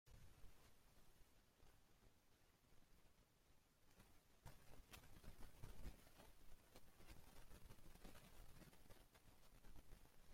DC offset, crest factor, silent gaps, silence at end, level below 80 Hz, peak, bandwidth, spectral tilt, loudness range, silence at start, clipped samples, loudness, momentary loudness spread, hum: under 0.1%; 20 dB; none; 0 s; -68 dBFS; -42 dBFS; 16.5 kHz; -4 dB/octave; 2 LU; 0.05 s; under 0.1%; -67 LUFS; 5 LU; none